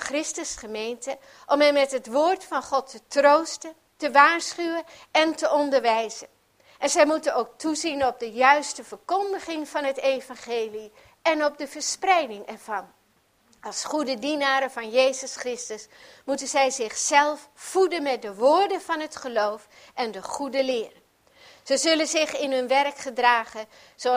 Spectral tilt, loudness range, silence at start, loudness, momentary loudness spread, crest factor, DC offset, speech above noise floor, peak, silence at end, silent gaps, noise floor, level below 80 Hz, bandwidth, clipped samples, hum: -1 dB/octave; 5 LU; 0 s; -24 LUFS; 14 LU; 22 dB; under 0.1%; 40 dB; -2 dBFS; 0 s; none; -65 dBFS; -66 dBFS; 15.5 kHz; under 0.1%; none